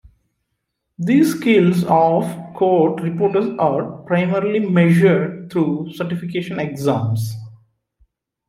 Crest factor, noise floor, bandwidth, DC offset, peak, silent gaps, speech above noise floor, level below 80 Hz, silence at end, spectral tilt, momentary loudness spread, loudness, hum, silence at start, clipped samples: 16 dB; -75 dBFS; 15.5 kHz; under 0.1%; -2 dBFS; none; 58 dB; -58 dBFS; 0.95 s; -7.5 dB/octave; 10 LU; -18 LUFS; none; 1 s; under 0.1%